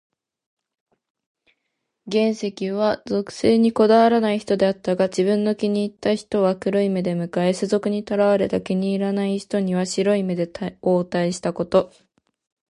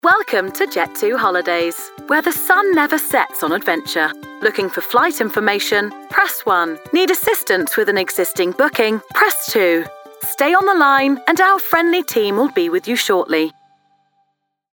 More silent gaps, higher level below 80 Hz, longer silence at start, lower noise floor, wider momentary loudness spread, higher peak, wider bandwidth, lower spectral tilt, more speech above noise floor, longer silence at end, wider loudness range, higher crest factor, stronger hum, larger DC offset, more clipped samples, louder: neither; first, -58 dBFS vs -64 dBFS; first, 2.05 s vs 0.05 s; first, -77 dBFS vs -69 dBFS; about the same, 7 LU vs 6 LU; second, -4 dBFS vs 0 dBFS; second, 11.5 kHz vs over 20 kHz; first, -6.5 dB/octave vs -2.5 dB/octave; first, 57 dB vs 52 dB; second, 0.85 s vs 1.25 s; about the same, 4 LU vs 3 LU; about the same, 18 dB vs 16 dB; neither; neither; neither; second, -21 LUFS vs -16 LUFS